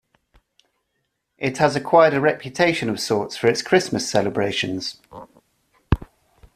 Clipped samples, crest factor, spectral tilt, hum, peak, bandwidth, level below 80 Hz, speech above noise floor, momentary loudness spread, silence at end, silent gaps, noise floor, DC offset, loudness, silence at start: under 0.1%; 20 dB; -4.5 dB/octave; none; -2 dBFS; 14.5 kHz; -40 dBFS; 54 dB; 11 LU; 0.5 s; none; -74 dBFS; under 0.1%; -20 LUFS; 1.4 s